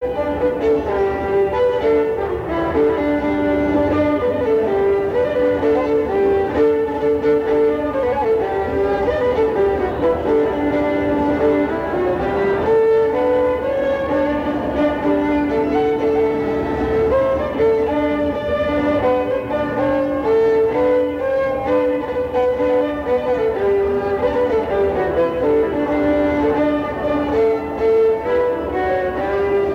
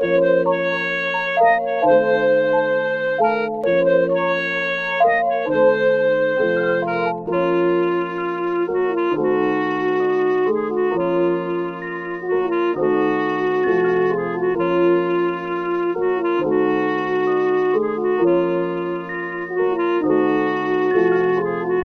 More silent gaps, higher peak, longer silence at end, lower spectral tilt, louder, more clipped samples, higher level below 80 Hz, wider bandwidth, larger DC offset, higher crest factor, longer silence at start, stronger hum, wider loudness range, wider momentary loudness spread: neither; about the same, -6 dBFS vs -4 dBFS; about the same, 0 s vs 0 s; about the same, -8 dB/octave vs -7.5 dB/octave; about the same, -18 LUFS vs -19 LUFS; neither; first, -38 dBFS vs -58 dBFS; first, 7.2 kHz vs 6.2 kHz; neither; about the same, 10 dB vs 14 dB; about the same, 0 s vs 0 s; neither; about the same, 1 LU vs 2 LU; about the same, 4 LU vs 6 LU